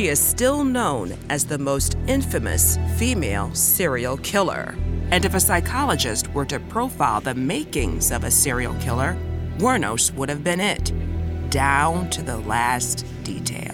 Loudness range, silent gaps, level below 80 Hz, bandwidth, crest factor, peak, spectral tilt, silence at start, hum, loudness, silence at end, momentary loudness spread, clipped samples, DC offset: 2 LU; none; -32 dBFS; 19 kHz; 16 dB; -4 dBFS; -3.5 dB/octave; 0 s; none; -21 LUFS; 0 s; 9 LU; under 0.1%; under 0.1%